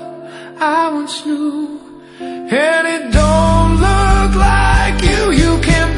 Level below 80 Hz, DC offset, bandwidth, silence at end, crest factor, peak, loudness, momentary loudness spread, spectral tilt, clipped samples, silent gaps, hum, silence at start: -18 dBFS; under 0.1%; 11 kHz; 0 s; 12 dB; 0 dBFS; -13 LUFS; 16 LU; -5.5 dB/octave; under 0.1%; none; none; 0 s